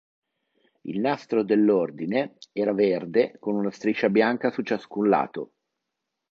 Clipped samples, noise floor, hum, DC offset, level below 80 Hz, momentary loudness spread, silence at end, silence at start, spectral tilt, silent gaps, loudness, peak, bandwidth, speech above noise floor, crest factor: under 0.1%; -83 dBFS; none; under 0.1%; -72 dBFS; 11 LU; 0.85 s; 0.85 s; -7.5 dB/octave; none; -24 LUFS; -6 dBFS; 7 kHz; 59 dB; 18 dB